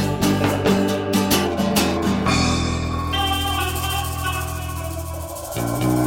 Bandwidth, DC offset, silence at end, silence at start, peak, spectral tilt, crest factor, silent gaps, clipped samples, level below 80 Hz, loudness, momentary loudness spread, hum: 17 kHz; under 0.1%; 0 s; 0 s; -4 dBFS; -4.5 dB/octave; 16 dB; none; under 0.1%; -36 dBFS; -21 LUFS; 9 LU; none